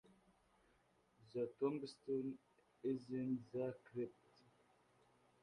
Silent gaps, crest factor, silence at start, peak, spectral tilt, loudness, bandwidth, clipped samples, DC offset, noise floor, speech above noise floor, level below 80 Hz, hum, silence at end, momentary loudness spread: none; 20 dB; 1.2 s; -28 dBFS; -8 dB/octave; -46 LUFS; 10.5 kHz; under 0.1%; under 0.1%; -77 dBFS; 32 dB; -84 dBFS; none; 1.3 s; 8 LU